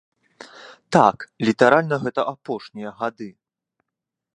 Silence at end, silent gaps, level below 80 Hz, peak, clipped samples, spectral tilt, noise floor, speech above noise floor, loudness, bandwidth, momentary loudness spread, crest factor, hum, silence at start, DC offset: 1.05 s; none; -66 dBFS; 0 dBFS; under 0.1%; -6 dB/octave; -85 dBFS; 64 dB; -20 LUFS; 11.5 kHz; 22 LU; 22 dB; none; 0.4 s; under 0.1%